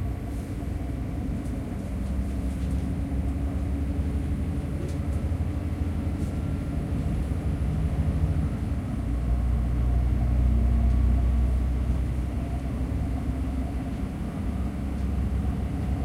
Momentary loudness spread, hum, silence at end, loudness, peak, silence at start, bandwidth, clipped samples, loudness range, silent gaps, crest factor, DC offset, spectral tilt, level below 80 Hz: 7 LU; none; 0 s; -29 LUFS; -12 dBFS; 0 s; 11.5 kHz; under 0.1%; 5 LU; none; 14 dB; under 0.1%; -8.5 dB/octave; -28 dBFS